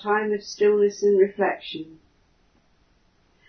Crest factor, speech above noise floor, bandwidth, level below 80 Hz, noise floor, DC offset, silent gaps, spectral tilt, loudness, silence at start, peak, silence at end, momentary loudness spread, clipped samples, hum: 16 dB; 40 dB; 6.6 kHz; -66 dBFS; -62 dBFS; under 0.1%; none; -5 dB/octave; -22 LUFS; 0 s; -8 dBFS; 1.65 s; 16 LU; under 0.1%; none